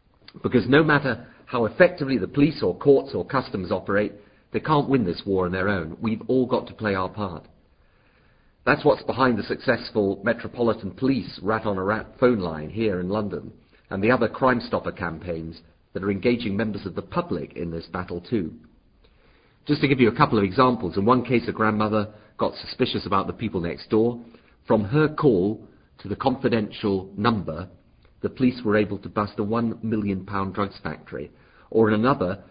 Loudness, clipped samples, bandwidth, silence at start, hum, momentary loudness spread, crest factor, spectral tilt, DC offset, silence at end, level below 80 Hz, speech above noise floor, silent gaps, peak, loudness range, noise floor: -24 LUFS; under 0.1%; 5.2 kHz; 0.45 s; none; 13 LU; 22 dB; -11.5 dB/octave; under 0.1%; 0.1 s; -48 dBFS; 36 dB; none; -2 dBFS; 5 LU; -59 dBFS